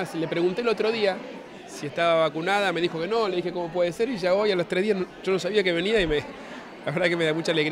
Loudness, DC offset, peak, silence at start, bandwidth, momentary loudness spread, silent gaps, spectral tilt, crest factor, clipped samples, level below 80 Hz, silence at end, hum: -25 LUFS; under 0.1%; -8 dBFS; 0 s; 15.5 kHz; 12 LU; none; -5 dB/octave; 16 dB; under 0.1%; -52 dBFS; 0 s; none